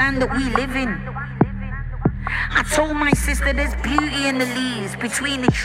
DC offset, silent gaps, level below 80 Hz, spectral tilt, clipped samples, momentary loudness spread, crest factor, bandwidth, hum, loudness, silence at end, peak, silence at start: under 0.1%; none; -28 dBFS; -4.5 dB/octave; under 0.1%; 7 LU; 20 dB; 16.5 kHz; none; -21 LUFS; 0 s; -2 dBFS; 0 s